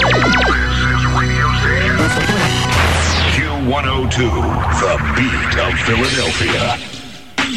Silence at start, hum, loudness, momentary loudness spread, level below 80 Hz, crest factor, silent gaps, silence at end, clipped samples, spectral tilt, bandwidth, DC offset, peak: 0 s; none; -14 LUFS; 4 LU; -24 dBFS; 12 dB; none; 0 s; under 0.1%; -4.5 dB/octave; 15 kHz; 1%; -2 dBFS